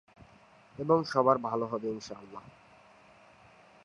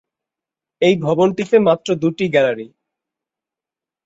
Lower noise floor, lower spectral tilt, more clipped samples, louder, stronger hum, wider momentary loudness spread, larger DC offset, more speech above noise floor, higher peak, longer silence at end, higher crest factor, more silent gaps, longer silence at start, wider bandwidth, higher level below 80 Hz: second, -59 dBFS vs -88 dBFS; about the same, -6.5 dB/octave vs -6.5 dB/octave; neither; second, -30 LUFS vs -16 LUFS; neither; first, 23 LU vs 5 LU; neither; second, 29 dB vs 73 dB; second, -10 dBFS vs -2 dBFS; about the same, 1.45 s vs 1.4 s; first, 22 dB vs 16 dB; neither; second, 0.2 s vs 0.8 s; first, 11 kHz vs 8 kHz; second, -70 dBFS vs -60 dBFS